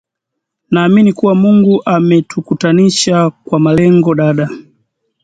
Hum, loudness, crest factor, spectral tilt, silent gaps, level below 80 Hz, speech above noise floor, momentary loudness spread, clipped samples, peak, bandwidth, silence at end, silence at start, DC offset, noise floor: none; -11 LUFS; 10 dB; -6 dB/octave; none; -48 dBFS; 67 dB; 8 LU; under 0.1%; 0 dBFS; 9.4 kHz; 0.65 s; 0.7 s; under 0.1%; -76 dBFS